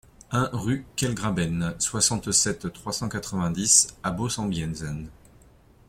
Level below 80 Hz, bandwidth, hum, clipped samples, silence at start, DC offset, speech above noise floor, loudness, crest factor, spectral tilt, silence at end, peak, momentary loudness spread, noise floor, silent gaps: -48 dBFS; 16.5 kHz; none; under 0.1%; 0.3 s; under 0.1%; 29 dB; -24 LUFS; 24 dB; -3 dB/octave; 0.75 s; -4 dBFS; 14 LU; -55 dBFS; none